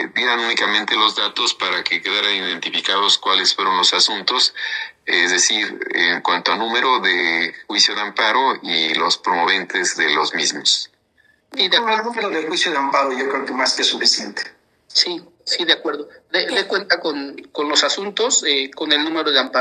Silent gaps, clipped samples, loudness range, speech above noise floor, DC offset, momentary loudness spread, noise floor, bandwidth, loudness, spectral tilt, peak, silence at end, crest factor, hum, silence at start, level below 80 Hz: none; under 0.1%; 3 LU; 40 dB; under 0.1%; 7 LU; -59 dBFS; 12.5 kHz; -17 LUFS; 0 dB/octave; 0 dBFS; 0 s; 18 dB; none; 0 s; -74 dBFS